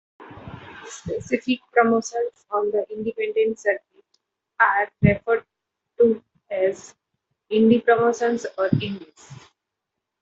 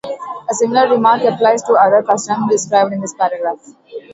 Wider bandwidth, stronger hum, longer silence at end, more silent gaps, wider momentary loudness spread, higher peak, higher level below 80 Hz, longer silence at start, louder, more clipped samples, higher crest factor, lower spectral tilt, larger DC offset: about the same, 8 kHz vs 8 kHz; neither; first, 0.85 s vs 0.15 s; neither; first, 18 LU vs 13 LU; about the same, -2 dBFS vs 0 dBFS; first, -52 dBFS vs -62 dBFS; first, 0.2 s vs 0.05 s; second, -22 LUFS vs -14 LUFS; neither; first, 20 dB vs 14 dB; first, -6 dB/octave vs -4 dB/octave; neither